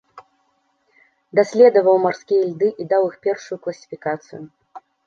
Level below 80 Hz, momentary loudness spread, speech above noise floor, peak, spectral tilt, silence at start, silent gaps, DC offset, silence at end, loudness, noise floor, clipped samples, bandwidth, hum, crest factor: -72 dBFS; 17 LU; 48 dB; -2 dBFS; -6 dB/octave; 0.15 s; none; under 0.1%; 0.3 s; -18 LUFS; -66 dBFS; under 0.1%; 7.2 kHz; none; 18 dB